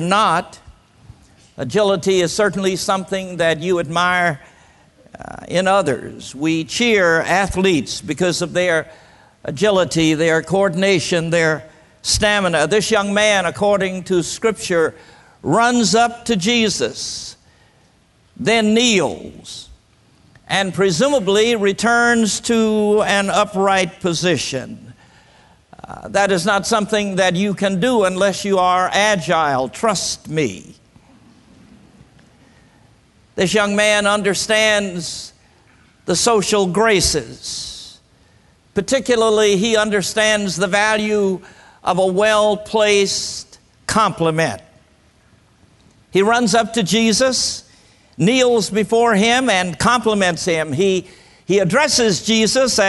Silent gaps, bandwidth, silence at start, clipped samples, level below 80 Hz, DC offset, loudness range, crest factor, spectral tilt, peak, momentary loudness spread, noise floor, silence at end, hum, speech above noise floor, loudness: none; 12 kHz; 0 s; under 0.1%; -46 dBFS; under 0.1%; 4 LU; 18 dB; -3.5 dB/octave; 0 dBFS; 12 LU; -55 dBFS; 0 s; none; 38 dB; -16 LUFS